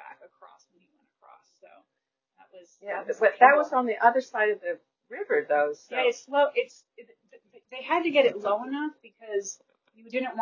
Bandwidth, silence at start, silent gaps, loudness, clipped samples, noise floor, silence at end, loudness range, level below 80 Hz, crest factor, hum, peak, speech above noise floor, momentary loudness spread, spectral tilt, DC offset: 7.4 kHz; 0 s; none; -25 LUFS; under 0.1%; -84 dBFS; 0 s; 5 LU; -84 dBFS; 24 dB; none; -2 dBFS; 58 dB; 20 LU; -2.5 dB/octave; under 0.1%